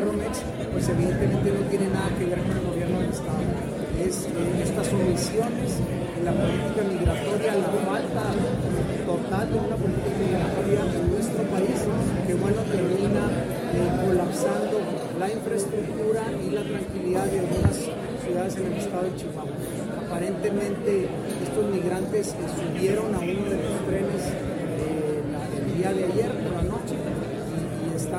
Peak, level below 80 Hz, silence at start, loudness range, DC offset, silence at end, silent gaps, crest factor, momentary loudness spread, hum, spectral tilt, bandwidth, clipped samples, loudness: -8 dBFS; -42 dBFS; 0 s; 3 LU; under 0.1%; 0 s; none; 18 dB; 6 LU; none; -6.5 dB/octave; 16 kHz; under 0.1%; -26 LUFS